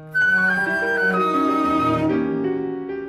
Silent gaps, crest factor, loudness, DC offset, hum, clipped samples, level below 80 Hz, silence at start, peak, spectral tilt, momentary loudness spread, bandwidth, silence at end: none; 12 dB; -19 LUFS; under 0.1%; none; under 0.1%; -52 dBFS; 0 s; -8 dBFS; -6.5 dB/octave; 7 LU; 15 kHz; 0 s